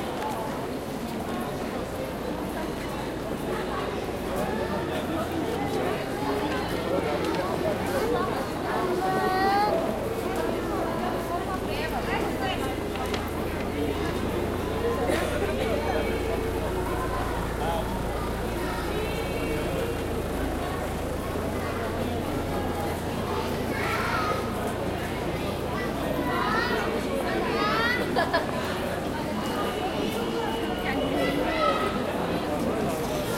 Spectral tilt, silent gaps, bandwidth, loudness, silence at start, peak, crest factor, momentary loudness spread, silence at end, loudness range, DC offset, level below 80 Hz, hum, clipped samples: -5.5 dB/octave; none; 16 kHz; -28 LUFS; 0 s; -10 dBFS; 16 dB; 6 LU; 0 s; 3 LU; under 0.1%; -40 dBFS; none; under 0.1%